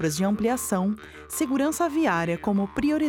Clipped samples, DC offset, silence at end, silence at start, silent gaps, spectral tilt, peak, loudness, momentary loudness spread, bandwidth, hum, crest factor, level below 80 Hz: under 0.1%; under 0.1%; 0 s; 0 s; none; -5 dB/octave; -10 dBFS; -25 LUFS; 6 LU; 18 kHz; none; 14 dB; -52 dBFS